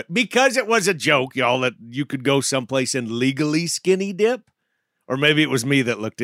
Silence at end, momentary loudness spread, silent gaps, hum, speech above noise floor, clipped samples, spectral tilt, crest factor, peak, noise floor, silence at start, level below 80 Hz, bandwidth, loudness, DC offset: 0 s; 7 LU; none; none; 54 dB; under 0.1%; -4 dB/octave; 18 dB; -2 dBFS; -74 dBFS; 0.1 s; -70 dBFS; 16 kHz; -20 LUFS; under 0.1%